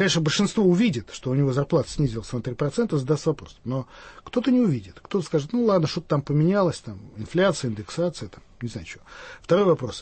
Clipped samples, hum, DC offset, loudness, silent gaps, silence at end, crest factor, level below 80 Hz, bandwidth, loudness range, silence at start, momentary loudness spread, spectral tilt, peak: under 0.1%; none; under 0.1%; -24 LUFS; none; 0 s; 14 dB; -50 dBFS; 8.8 kHz; 3 LU; 0 s; 17 LU; -6 dB/octave; -8 dBFS